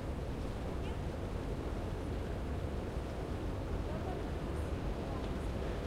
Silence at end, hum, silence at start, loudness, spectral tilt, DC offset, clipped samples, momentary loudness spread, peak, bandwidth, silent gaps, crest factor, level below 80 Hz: 0 s; none; 0 s; -40 LUFS; -7 dB/octave; under 0.1%; under 0.1%; 2 LU; -26 dBFS; 15.5 kHz; none; 12 dB; -42 dBFS